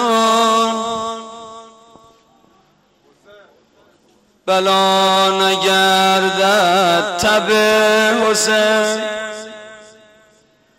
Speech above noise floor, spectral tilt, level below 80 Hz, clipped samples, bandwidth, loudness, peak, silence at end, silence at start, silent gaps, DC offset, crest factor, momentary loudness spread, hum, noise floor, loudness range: 42 dB; -2.5 dB/octave; -56 dBFS; under 0.1%; 16 kHz; -14 LUFS; -6 dBFS; 1 s; 0 s; none; under 0.1%; 12 dB; 17 LU; none; -55 dBFS; 11 LU